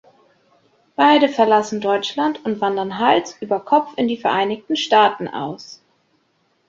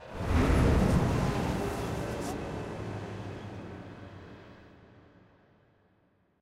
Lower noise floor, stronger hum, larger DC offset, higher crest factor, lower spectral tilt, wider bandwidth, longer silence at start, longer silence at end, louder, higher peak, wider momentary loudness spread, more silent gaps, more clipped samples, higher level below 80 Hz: second, -64 dBFS vs -69 dBFS; neither; neither; about the same, 18 dB vs 18 dB; second, -4.5 dB/octave vs -7 dB/octave; second, 7.8 kHz vs 15.5 kHz; first, 1 s vs 0 s; second, 0.95 s vs 1.55 s; first, -18 LUFS vs -31 LUFS; first, -2 dBFS vs -14 dBFS; second, 12 LU vs 22 LU; neither; neither; second, -64 dBFS vs -38 dBFS